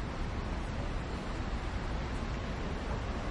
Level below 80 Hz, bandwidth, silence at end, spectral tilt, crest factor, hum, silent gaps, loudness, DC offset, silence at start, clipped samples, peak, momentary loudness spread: -38 dBFS; 11 kHz; 0 s; -6 dB/octave; 12 dB; none; none; -38 LUFS; under 0.1%; 0 s; under 0.1%; -24 dBFS; 1 LU